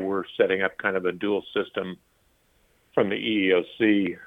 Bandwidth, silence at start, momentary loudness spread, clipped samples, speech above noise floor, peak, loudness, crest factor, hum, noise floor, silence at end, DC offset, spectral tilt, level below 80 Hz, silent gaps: 4 kHz; 0 s; 9 LU; under 0.1%; 40 dB; -6 dBFS; -25 LUFS; 18 dB; none; -65 dBFS; 0 s; under 0.1%; -7.5 dB/octave; -66 dBFS; none